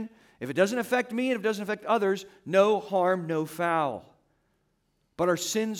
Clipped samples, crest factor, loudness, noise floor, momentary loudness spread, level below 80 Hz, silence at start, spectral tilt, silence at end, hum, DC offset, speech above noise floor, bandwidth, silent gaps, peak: under 0.1%; 18 dB; -27 LUFS; -73 dBFS; 9 LU; -72 dBFS; 0 s; -4.5 dB/octave; 0 s; none; under 0.1%; 46 dB; 18 kHz; none; -10 dBFS